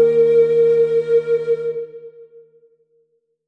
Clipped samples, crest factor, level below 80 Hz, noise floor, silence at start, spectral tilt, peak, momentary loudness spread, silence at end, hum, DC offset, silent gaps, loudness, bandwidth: under 0.1%; 12 dB; -70 dBFS; -65 dBFS; 0 s; -7.5 dB/octave; -6 dBFS; 13 LU; 1.25 s; none; under 0.1%; none; -16 LUFS; 4.4 kHz